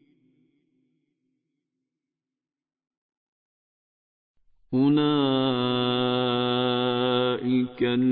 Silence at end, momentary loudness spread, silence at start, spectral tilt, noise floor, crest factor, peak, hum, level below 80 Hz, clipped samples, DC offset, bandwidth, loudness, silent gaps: 0 s; 3 LU; 4.7 s; -10.5 dB/octave; under -90 dBFS; 16 dB; -12 dBFS; none; -68 dBFS; under 0.1%; under 0.1%; 4.4 kHz; -24 LUFS; none